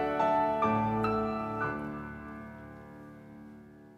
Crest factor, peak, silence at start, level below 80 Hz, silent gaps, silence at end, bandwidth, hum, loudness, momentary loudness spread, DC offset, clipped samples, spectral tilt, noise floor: 16 dB; -16 dBFS; 0 s; -58 dBFS; none; 0 s; 13 kHz; none; -31 LUFS; 22 LU; under 0.1%; under 0.1%; -8 dB/octave; -52 dBFS